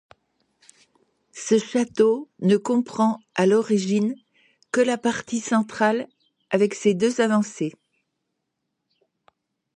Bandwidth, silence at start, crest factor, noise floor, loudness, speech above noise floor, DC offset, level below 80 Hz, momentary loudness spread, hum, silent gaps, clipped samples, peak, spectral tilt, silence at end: 11 kHz; 1.35 s; 18 dB; -79 dBFS; -22 LUFS; 58 dB; under 0.1%; -70 dBFS; 8 LU; none; none; under 0.1%; -6 dBFS; -5.5 dB/octave; 2.05 s